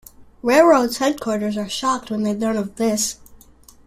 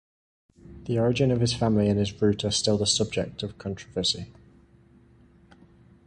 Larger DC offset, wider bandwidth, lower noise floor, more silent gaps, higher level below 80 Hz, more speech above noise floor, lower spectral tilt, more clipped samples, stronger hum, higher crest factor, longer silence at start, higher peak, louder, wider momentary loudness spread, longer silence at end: neither; first, 16 kHz vs 11 kHz; second, -48 dBFS vs -56 dBFS; neither; about the same, -52 dBFS vs -50 dBFS; about the same, 29 dB vs 31 dB; about the same, -4 dB/octave vs -5 dB/octave; neither; neither; about the same, 18 dB vs 18 dB; second, 0.2 s vs 0.65 s; first, -2 dBFS vs -10 dBFS; first, -19 LUFS vs -25 LUFS; about the same, 10 LU vs 11 LU; second, 0.5 s vs 1.75 s